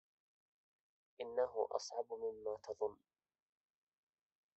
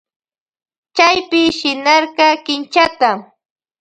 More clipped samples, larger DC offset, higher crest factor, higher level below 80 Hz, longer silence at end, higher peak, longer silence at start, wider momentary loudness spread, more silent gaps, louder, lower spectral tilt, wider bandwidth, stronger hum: neither; neither; first, 24 dB vs 16 dB; second, -84 dBFS vs -56 dBFS; first, 1.6 s vs 0.6 s; second, -22 dBFS vs 0 dBFS; first, 1.2 s vs 0.95 s; about the same, 7 LU vs 6 LU; neither; second, -43 LUFS vs -13 LUFS; about the same, -2 dB/octave vs -2.5 dB/octave; second, 7.6 kHz vs 9.2 kHz; neither